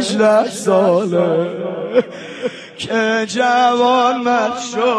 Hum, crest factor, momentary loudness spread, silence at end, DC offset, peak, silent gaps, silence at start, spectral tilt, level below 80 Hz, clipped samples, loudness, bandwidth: none; 14 dB; 12 LU; 0 s; under 0.1%; -2 dBFS; none; 0 s; -4.5 dB/octave; -64 dBFS; under 0.1%; -16 LUFS; 11 kHz